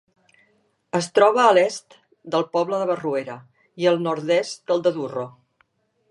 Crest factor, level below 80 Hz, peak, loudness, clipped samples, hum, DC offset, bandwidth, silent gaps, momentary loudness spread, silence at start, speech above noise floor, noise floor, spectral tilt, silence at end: 20 dB; -76 dBFS; -2 dBFS; -21 LUFS; under 0.1%; none; under 0.1%; 11.5 kHz; none; 15 LU; 0.95 s; 45 dB; -66 dBFS; -4.5 dB/octave; 0.8 s